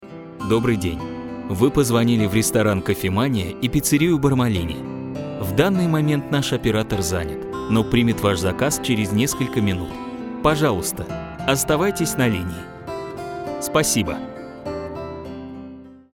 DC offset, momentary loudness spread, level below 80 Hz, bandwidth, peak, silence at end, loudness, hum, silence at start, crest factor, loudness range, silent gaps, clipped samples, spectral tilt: under 0.1%; 13 LU; -42 dBFS; 18 kHz; -2 dBFS; 0.15 s; -21 LUFS; none; 0 s; 20 dB; 4 LU; none; under 0.1%; -5 dB/octave